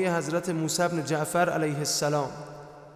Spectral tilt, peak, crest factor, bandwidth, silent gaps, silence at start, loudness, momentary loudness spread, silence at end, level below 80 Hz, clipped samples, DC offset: -4 dB/octave; -14 dBFS; 14 dB; 16 kHz; none; 0 s; -27 LUFS; 13 LU; 0 s; -64 dBFS; under 0.1%; under 0.1%